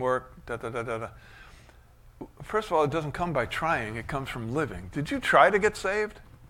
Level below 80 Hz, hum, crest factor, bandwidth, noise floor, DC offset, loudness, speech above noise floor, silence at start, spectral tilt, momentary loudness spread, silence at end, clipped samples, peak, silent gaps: -50 dBFS; none; 24 dB; 16.5 kHz; -54 dBFS; under 0.1%; -27 LUFS; 26 dB; 0 s; -5.5 dB/octave; 15 LU; 0.05 s; under 0.1%; -4 dBFS; none